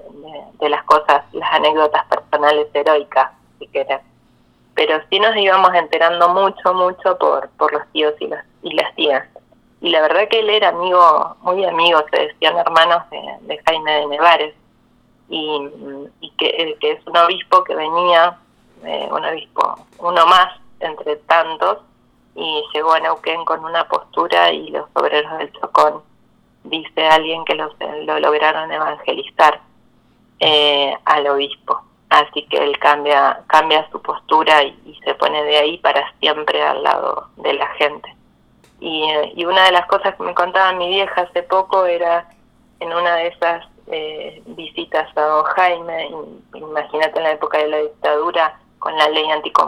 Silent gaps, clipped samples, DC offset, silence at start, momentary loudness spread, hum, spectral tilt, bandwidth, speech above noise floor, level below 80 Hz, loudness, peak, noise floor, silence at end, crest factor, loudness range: none; under 0.1%; under 0.1%; 0.05 s; 13 LU; none; -3 dB/octave; 14 kHz; 39 dB; -60 dBFS; -16 LUFS; 0 dBFS; -55 dBFS; 0 s; 16 dB; 4 LU